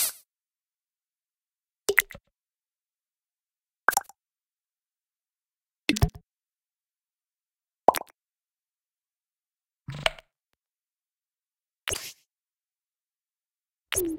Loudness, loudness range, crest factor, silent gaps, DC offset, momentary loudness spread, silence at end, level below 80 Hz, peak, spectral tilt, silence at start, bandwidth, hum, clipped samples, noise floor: -28 LUFS; 7 LU; 34 dB; none; under 0.1%; 15 LU; 0 s; -46 dBFS; 0 dBFS; -3 dB/octave; 0 s; 16.5 kHz; none; under 0.1%; under -90 dBFS